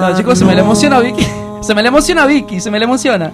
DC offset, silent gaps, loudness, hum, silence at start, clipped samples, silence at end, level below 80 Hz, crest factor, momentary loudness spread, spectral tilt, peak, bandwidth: under 0.1%; none; -11 LUFS; none; 0 s; 0.5%; 0 s; -34 dBFS; 10 dB; 8 LU; -5 dB/octave; 0 dBFS; 13.5 kHz